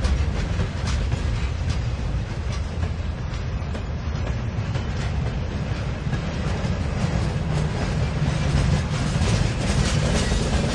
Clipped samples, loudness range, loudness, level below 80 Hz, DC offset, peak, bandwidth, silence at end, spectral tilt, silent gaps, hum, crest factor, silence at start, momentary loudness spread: under 0.1%; 5 LU; -25 LUFS; -28 dBFS; under 0.1%; -8 dBFS; 11.5 kHz; 0 s; -6 dB/octave; none; none; 16 dB; 0 s; 6 LU